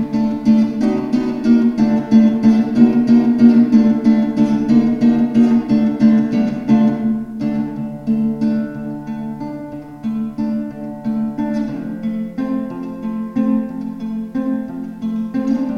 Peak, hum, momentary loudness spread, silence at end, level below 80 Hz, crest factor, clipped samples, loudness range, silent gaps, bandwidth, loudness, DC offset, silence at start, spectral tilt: 0 dBFS; none; 13 LU; 0 s; -48 dBFS; 16 dB; under 0.1%; 10 LU; none; 6.4 kHz; -16 LUFS; under 0.1%; 0 s; -8.5 dB/octave